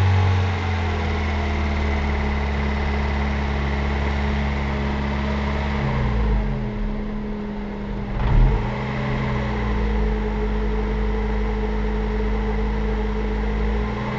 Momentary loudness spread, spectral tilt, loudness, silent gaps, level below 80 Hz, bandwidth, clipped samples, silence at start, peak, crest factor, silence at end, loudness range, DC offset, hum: 5 LU; -7.5 dB/octave; -24 LUFS; none; -24 dBFS; 7.4 kHz; under 0.1%; 0 s; -8 dBFS; 14 dB; 0 s; 1 LU; under 0.1%; none